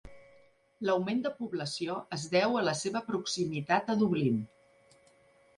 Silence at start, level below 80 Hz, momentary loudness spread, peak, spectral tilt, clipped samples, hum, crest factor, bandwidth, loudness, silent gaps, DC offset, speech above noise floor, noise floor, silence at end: 0.05 s; -68 dBFS; 8 LU; -12 dBFS; -5 dB/octave; under 0.1%; none; 20 dB; 11.5 kHz; -31 LUFS; none; under 0.1%; 33 dB; -64 dBFS; 1.1 s